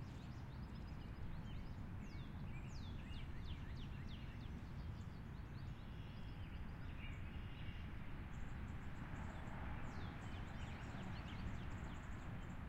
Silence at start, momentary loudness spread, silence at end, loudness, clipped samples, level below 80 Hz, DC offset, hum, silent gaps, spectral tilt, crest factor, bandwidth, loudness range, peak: 0 s; 3 LU; 0 s; -52 LUFS; under 0.1%; -54 dBFS; under 0.1%; none; none; -6.5 dB/octave; 14 dB; 15.5 kHz; 2 LU; -36 dBFS